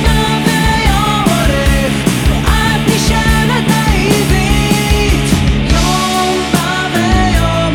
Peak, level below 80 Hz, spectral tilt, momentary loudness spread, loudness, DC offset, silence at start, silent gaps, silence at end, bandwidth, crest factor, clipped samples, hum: 0 dBFS; -18 dBFS; -4.5 dB/octave; 2 LU; -12 LUFS; under 0.1%; 0 s; none; 0 s; 19 kHz; 10 dB; under 0.1%; none